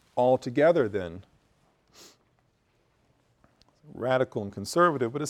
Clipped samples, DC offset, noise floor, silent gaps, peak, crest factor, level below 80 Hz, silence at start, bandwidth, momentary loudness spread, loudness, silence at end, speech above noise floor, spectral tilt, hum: under 0.1%; under 0.1%; -69 dBFS; none; -10 dBFS; 20 dB; -66 dBFS; 0.15 s; 14.5 kHz; 15 LU; -26 LUFS; 0 s; 44 dB; -6 dB/octave; none